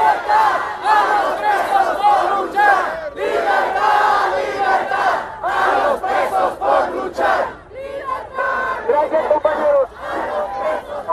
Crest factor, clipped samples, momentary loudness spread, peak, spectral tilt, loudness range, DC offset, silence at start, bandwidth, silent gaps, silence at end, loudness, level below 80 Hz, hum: 16 dB; under 0.1%; 8 LU; 0 dBFS; -3.5 dB/octave; 3 LU; under 0.1%; 0 s; 14 kHz; none; 0 s; -17 LUFS; -50 dBFS; none